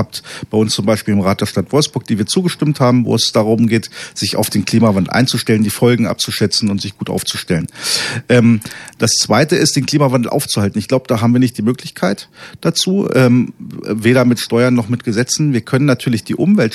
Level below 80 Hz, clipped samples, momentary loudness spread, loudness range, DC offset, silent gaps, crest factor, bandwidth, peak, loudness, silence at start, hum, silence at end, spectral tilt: -52 dBFS; under 0.1%; 7 LU; 2 LU; under 0.1%; none; 14 dB; 14.5 kHz; 0 dBFS; -14 LUFS; 0 s; none; 0 s; -5 dB/octave